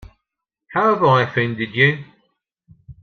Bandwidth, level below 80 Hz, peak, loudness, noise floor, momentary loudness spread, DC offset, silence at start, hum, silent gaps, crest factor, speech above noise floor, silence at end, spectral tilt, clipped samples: 6.6 kHz; -54 dBFS; -2 dBFS; -17 LUFS; -81 dBFS; 9 LU; under 0.1%; 0.7 s; none; none; 18 dB; 64 dB; 0.1 s; -7.5 dB/octave; under 0.1%